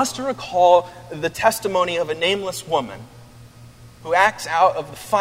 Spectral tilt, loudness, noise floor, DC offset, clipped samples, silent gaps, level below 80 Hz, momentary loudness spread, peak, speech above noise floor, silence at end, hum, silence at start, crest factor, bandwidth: -3 dB/octave; -19 LUFS; -44 dBFS; under 0.1%; under 0.1%; none; -54 dBFS; 14 LU; 0 dBFS; 24 dB; 0 s; none; 0 s; 20 dB; 16 kHz